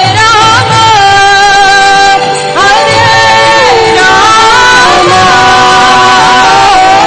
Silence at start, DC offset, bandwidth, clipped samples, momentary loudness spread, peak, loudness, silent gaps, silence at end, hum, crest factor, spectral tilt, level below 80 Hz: 0 s; 2%; 11 kHz; 8%; 2 LU; 0 dBFS; -3 LUFS; none; 0 s; none; 4 dB; -2.5 dB/octave; -32 dBFS